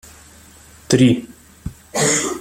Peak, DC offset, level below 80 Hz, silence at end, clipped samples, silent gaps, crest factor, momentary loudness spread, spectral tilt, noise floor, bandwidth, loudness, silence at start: -2 dBFS; under 0.1%; -46 dBFS; 0 s; under 0.1%; none; 18 dB; 21 LU; -4 dB/octave; -45 dBFS; 16 kHz; -17 LUFS; 0.9 s